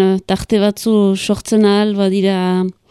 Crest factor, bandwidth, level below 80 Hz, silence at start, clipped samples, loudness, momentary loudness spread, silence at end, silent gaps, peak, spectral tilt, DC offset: 14 dB; 13.5 kHz; -44 dBFS; 0 s; under 0.1%; -15 LUFS; 5 LU; 0.2 s; none; 0 dBFS; -6 dB/octave; under 0.1%